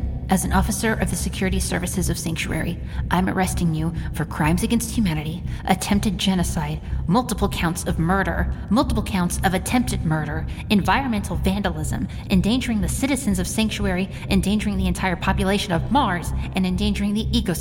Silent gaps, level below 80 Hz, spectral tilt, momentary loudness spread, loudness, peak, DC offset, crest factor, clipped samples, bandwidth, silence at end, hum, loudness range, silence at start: none; -30 dBFS; -5 dB/octave; 6 LU; -22 LUFS; -4 dBFS; under 0.1%; 18 dB; under 0.1%; 17 kHz; 0 s; none; 1 LU; 0 s